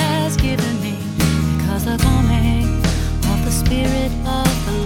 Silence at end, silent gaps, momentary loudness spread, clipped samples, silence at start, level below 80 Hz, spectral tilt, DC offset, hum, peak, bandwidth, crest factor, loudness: 0 s; none; 4 LU; under 0.1%; 0 s; -22 dBFS; -5.5 dB/octave; under 0.1%; none; 0 dBFS; 17.5 kHz; 16 dB; -18 LUFS